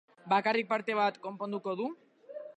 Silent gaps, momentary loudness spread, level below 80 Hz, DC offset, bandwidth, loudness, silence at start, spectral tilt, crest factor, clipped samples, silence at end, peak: none; 18 LU; -88 dBFS; under 0.1%; 9.6 kHz; -32 LUFS; 0.25 s; -6 dB/octave; 18 dB; under 0.1%; 0.05 s; -14 dBFS